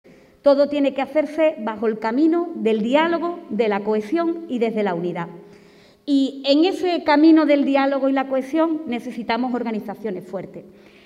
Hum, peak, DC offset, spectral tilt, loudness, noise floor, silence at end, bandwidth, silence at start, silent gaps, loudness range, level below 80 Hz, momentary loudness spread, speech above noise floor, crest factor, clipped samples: none; -4 dBFS; under 0.1%; -6.5 dB/octave; -20 LUFS; -50 dBFS; 0.4 s; 10.5 kHz; 0.45 s; none; 5 LU; -66 dBFS; 11 LU; 30 dB; 16 dB; under 0.1%